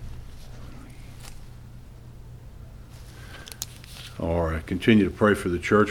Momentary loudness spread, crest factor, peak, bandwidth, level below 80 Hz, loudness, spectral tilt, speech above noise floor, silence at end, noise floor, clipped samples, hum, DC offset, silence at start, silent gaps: 25 LU; 20 dB; -6 dBFS; 18.5 kHz; -42 dBFS; -24 LUFS; -6 dB/octave; 22 dB; 0 s; -43 dBFS; under 0.1%; none; 0.1%; 0 s; none